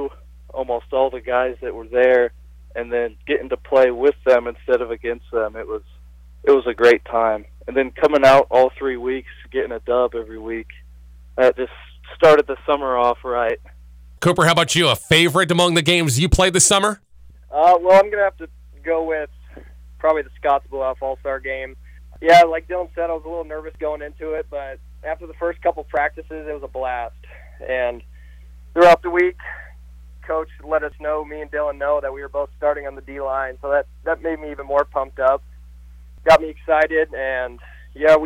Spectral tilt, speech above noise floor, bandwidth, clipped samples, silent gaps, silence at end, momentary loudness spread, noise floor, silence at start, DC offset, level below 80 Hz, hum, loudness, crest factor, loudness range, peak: -3.5 dB/octave; 24 dB; 16 kHz; under 0.1%; none; 0 s; 17 LU; -43 dBFS; 0 s; under 0.1%; -40 dBFS; none; -18 LUFS; 16 dB; 9 LU; -4 dBFS